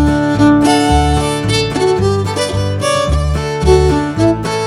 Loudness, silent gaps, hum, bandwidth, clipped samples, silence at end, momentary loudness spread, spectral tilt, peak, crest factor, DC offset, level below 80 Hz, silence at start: -13 LUFS; none; none; 14.5 kHz; under 0.1%; 0 s; 6 LU; -5.5 dB/octave; 0 dBFS; 12 dB; under 0.1%; -22 dBFS; 0 s